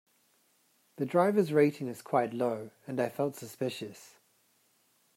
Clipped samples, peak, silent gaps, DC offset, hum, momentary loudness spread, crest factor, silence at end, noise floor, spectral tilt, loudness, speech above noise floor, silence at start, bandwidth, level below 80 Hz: under 0.1%; -12 dBFS; none; under 0.1%; none; 14 LU; 20 dB; 1.1 s; -70 dBFS; -6.5 dB/octave; -31 LUFS; 40 dB; 1 s; 16 kHz; -82 dBFS